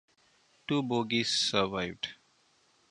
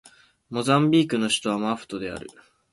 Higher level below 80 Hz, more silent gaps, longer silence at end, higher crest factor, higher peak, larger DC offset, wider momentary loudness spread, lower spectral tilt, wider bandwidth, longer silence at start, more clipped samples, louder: about the same, -64 dBFS vs -60 dBFS; neither; first, 0.75 s vs 0.4 s; first, 24 dB vs 18 dB; second, -10 dBFS vs -6 dBFS; neither; about the same, 13 LU vs 15 LU; second, -3.5 dB/octave vs -5 dB/octave; about the same, 11 kHz vs 11.5 kHz; first, 0.7 s vs 0.5 s; neither; second, -30 LUFS vs -23 LUFS